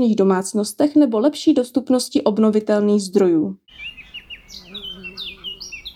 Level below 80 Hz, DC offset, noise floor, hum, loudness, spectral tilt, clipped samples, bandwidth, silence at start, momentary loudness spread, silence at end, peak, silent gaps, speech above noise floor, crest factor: -56 dBFS; under 0.1%; -39 dBFS; none; -18 LUFS; -5.5 dB/octave; under 0.1%; 15.5 kHz; 0 s; 18 LU; 0.05 s; -2 dBFS; none; 22 dB; 16 dB